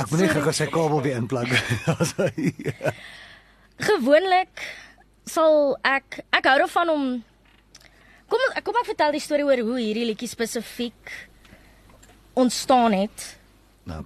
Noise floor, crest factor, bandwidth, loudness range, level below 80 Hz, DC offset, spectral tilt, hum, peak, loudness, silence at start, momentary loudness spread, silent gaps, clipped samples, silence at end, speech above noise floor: -54 dBFS; 22 dB; 13 kHz; 4 LU; -56 dBFS; under 0.1%; -4.5 dB/octave; none; -2 dBFS; -22 LUFS; 0 s; 17 LU; none; under 0.1%; 0 s; 31 dB